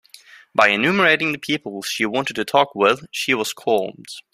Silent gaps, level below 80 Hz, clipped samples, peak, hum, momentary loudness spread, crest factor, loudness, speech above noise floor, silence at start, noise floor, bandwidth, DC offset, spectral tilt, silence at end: none; -64 dBFS; under 0.1%; -2 dBFS; none; 9 LU; 20 dB; -19 LUFS; 27 dB; 0.55 s; -47 dBFS; 16 kHz; under 0.1%; -3.5 dB/octave; 0.15 s